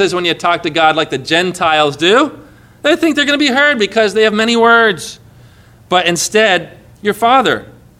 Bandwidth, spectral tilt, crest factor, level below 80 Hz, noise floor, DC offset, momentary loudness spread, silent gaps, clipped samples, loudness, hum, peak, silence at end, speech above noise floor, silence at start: 16 kHz; -3 dB/octave; 12 dB; -52 dBFS; -42 dBFS; under 0.1%; 7 LU; none; under 0.1%; -12 LUFS; none; 0 dBFS; 0.35 s; 30 dB; 0 s